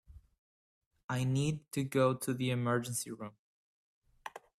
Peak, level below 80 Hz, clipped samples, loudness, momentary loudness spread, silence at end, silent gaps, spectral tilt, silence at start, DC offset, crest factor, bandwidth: -16 dBFS; -66 dBFS; under 0.1%; -34 LUFS; 19 LU; 0.2 s; 0.38-0.91 s, 1.03-1.08 s, 3.39-4.02 s; -5.5 dB/octave; 0.1 s; under 0.1%; 20 dB; 15 kHz